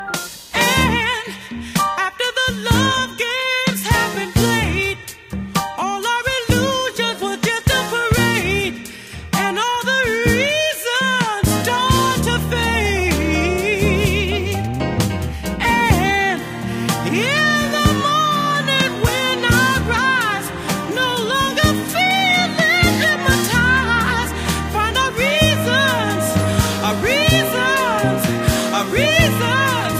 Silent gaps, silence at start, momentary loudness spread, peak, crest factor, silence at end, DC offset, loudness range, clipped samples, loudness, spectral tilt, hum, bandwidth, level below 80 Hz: none; 0 s; 7 LU; -2 dBFS; 16 dB; 0 s; under 0.1%; 3 LU; under 0.1%; -17 LUFS; -4 dB/octave; none; 15.5 kHz; -32 dBFS